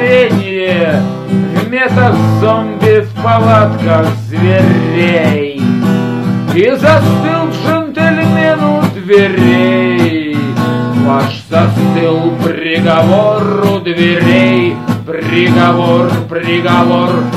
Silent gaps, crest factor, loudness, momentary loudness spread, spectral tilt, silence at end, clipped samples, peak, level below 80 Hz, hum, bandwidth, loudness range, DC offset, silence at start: none; 10 dB; -10 LUFS; 6 LU; -7.5 dB/octave; 0 s; 0.4%; 0 dBFS; -48 dBFS; none; 14 kHz; 1 LU; 0.2%; 0 s